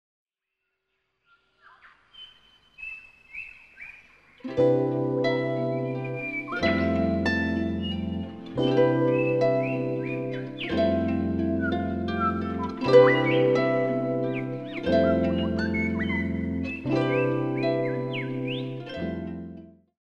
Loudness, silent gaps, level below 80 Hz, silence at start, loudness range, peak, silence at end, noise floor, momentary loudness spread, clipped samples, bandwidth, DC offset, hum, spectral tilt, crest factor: -26 LUFS; none; -50 dBFS; 2.15 s; 10 LU; -4 dBFS; 0.35 s; -82 dBFS; 17 LU; under 0.1%; 7.2 kHz; under 0.1%; none; -8 dB/octave; 22 dB